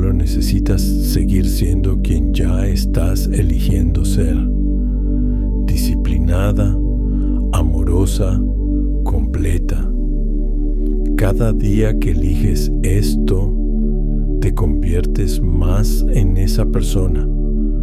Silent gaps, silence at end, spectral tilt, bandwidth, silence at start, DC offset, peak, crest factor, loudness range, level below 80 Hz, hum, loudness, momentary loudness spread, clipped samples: none; 0 s; -7 dB/octave; 14.5 kHz; 0 s; under 0.1%; -2 dBFS; 12 dB; 2 LU; -16 dBFS; none; -18 LUFS; 4 LU; under 0.1%